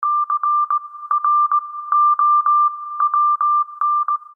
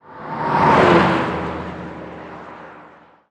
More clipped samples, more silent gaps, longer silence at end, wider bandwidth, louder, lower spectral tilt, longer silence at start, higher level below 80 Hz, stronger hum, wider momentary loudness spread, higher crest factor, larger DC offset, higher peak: neither; neither; second, 0.1 s vs 0.5 s; second, 1.8 kHz vs 10.5 kHz; about the same, -17 LUFS vs -16 LUFS; second, -1.5 dB/octave vs -7 dB/octave; about the same, 0 s vs 0.1 s; second, under -90 dBFS vs -44 dBFS; neither; second, 7 LU vs 23 LU; second, 10 dB vs 18 dB; neither; second, -6 dBFS vs -2 dBFS